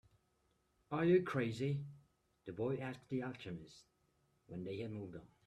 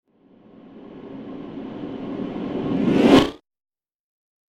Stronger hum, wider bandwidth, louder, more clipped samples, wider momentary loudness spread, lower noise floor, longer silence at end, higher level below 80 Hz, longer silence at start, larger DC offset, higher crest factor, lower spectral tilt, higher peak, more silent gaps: neither; second, 10 kHz vs 12.5 kHz; second, -40 LUFS vs -20 LUFS; neither; second, 19 LU vs 23 LU; first, -79 dBFS vs -53 dBFS; second, 0.2 s vs 1.1 s; second, -74 dBFS vs -50 dBFS; first, 0.9 s vs 0.65 s; neither; about the same, 20 dB vs 22 dB; first, -8 dB/octave vs -6.5 dB/octave; second, -20 dBFS vs 0 dBFS; neither